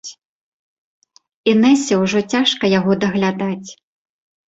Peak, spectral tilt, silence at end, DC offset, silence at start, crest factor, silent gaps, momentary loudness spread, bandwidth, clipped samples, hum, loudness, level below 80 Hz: -2 dBFS; -5 dB/octave; 0.75 s; under 0.1%; 0.05 s; 16 dB; 0.25-1.02 s, 1.34-1.44 s; 13 LU; 8.2 kHz; under 0.1%; none; -16 LUFS; -58 dBFS